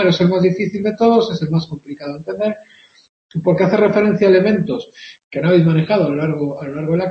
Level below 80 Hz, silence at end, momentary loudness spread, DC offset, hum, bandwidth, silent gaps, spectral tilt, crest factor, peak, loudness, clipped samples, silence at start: -54 dBFS; 0 s; 15 LU; under 0.1%; none; 6.6 kHz; 3.09-3.29 s, 5.24-5.31 s; -8 dB/octave; 14 dB; -2 dBFS; -16 LUFS; under 0.1%; 0 s